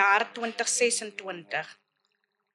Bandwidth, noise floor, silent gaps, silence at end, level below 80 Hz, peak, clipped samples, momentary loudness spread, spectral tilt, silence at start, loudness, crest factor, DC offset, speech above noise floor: 13 kHz; -76 dBFS; none; 0.8 s; under -90 dBFS; -10 dBFS; under 0.1%; 14 LU; -0.5 dB/octave; 0 s; -27 LUFS; 20 dB; under 0.1%; 47 dB